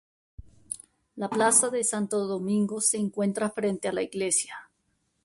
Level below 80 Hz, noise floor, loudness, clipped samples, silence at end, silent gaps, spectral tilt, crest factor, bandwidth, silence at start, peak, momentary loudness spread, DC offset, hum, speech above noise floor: -62 dBFS; -74 dBFS; -26 LUFS; under 0.1%; 0.6 s; none; -3.5 dB/octave; 22 dB; 12 kHz; 0.4 s; -6 dBFS; 18 LU; under 0.1%; none; 47 dB